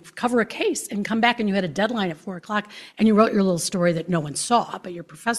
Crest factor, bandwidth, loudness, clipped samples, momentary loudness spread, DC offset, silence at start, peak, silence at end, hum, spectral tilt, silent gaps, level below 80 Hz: 20 dB; 13.5 kHz; -22 LUFS; under 0.1%; 11 LU; under 0.1%; 0.05 s; -4 dBFS; 0 s; none; -4.5 dB/octave; none; -62 dBFS